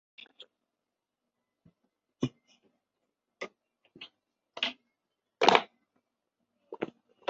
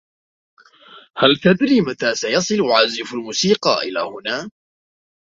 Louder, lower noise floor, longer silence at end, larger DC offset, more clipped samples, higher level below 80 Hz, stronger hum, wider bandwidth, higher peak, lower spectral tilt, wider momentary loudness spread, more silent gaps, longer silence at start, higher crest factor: second, -30 LUFS vs -17 LUFS; first, -87 dBFS vs -46 dBFS; second, 0.45 s vs 0.8 s; neither; neither; second, -78 dBFS vs -60 dBFS; neither; about the same, 7.6 kHz vs 7.8 kHz; about the same, -2 dBFS vs 0 dBFS; second, -1.5 dB/octave vs -4 dB/octave; first, 27 LU vs 11 LU; neither; first, 2.2 s vs 0.95 s; first, 34 dB vs 20 dB